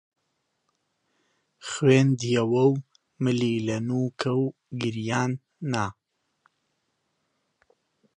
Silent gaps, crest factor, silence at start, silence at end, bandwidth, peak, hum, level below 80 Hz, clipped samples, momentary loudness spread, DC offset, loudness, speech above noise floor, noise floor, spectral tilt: none; 22 dB; 1.65 s; 2.25 s; 10 kHz; -6 dBFS; none; -64 dBFS; under 0.1%; 11 LU; under 0.1%; -25 LUFS; 53 dB; -76 dBFS; -6.5 dB/octave